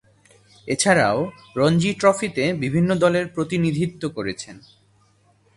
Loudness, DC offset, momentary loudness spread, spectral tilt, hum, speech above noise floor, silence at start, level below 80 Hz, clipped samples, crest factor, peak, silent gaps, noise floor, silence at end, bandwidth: -21 LUFS; under 0.1%; 11 LU; -5 dB/octave; none; 39 dB; 0.65 s; -54 dBFS; under 0.1%; 20 dB; -2 dBFS; none; -59 dBFS; 1 s; 11.5 kHz